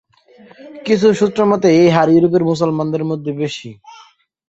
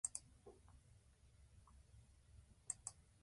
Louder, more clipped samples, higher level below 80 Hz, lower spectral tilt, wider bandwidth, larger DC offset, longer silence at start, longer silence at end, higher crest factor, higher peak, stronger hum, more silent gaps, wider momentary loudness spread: first, -14 LUFS vs -52 LUFS; neither; first, -56 dBFS vs -70 dBFS; first, -7 dB/octave vs -2 dB/octave; second, 8 kHz vs 11.5 kHz; neither; first, 0.65 s vs 0.05 s; first, 0.55 s vs 0 s; second, 14 dB vs 32 dB; first, -2 dBFS vs -26 dBFS; neither; neither; second, 13 LU vs 19 LU